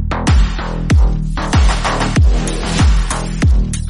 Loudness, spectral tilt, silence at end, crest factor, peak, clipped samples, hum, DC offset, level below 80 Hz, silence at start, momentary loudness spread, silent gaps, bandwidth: -15 LUFS; -5.5 dB/octave; 0 s; 10 dB; -2 dBFS; under 0.1%; none; under 0.1%; -14 dBFS; 0 s; 5 LU; none; 11.5 kHz